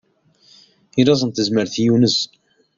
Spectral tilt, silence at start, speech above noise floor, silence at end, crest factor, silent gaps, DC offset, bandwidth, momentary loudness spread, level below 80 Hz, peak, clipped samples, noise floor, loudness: -5.5 dB/octave; 0.95 s; 39 dB; 0.5 s; 18 dB; none; under 0.1%; 7.6 kHz; 7 LU; -56 dBFS; -2 dBFS; under 0.1%; -55 dBFS; -17 LUFS